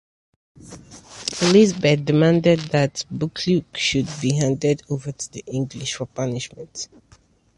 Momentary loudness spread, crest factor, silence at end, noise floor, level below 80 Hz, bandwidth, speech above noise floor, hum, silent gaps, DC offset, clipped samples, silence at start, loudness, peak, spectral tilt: 17 LU; 18 dB; 0.7 s; -42 dBFS; -52 dBFS; 11.5 kHz; 22 dB; none; none; under 0.1%; under 0.1%; 0.65 s; -21 LUFS; -4 dBFS; -5 dB/octave